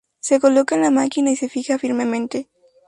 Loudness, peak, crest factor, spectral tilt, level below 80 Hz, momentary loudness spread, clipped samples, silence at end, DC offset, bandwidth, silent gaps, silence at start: -19 LUFS; -4 dBFS; 16 dB; -3.5 dB/octave; -66 dBFS; 9 LU; under 0.1%; 0.45 s; under 0.1%; 11.5 kHz; none; 0.25 s